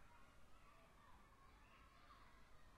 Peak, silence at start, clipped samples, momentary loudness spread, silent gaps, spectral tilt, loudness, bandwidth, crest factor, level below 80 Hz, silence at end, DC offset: -54 dBFS; 0 s; under 0.1%; 2 LU; none; -4 dB/octave; -69 LUFS; 13 kHz; 12 dB; -72 dBFS; 0 s; under 0.1%